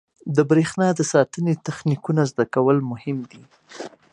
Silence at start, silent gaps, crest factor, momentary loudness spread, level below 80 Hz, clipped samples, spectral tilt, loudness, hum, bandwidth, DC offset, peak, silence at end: 0.25 s; none; 20 dB; 16 LU; -64 dBFS; under 0.1%; -6.5 dB/octave; -21 LUFS; none; 11 kHz; under 0.1%; -2 dBFS; 0.25 s